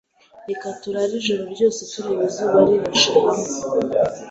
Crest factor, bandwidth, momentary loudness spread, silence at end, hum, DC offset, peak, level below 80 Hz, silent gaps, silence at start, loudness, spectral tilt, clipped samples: 18 dB; 8.2 kHz; 13 LU; 0 s; none; under 0.1%; -2 dBFS; -58 dBFS; none; 0.35 s; -19 LUFS; -3.5 dB/octave; under 0.1%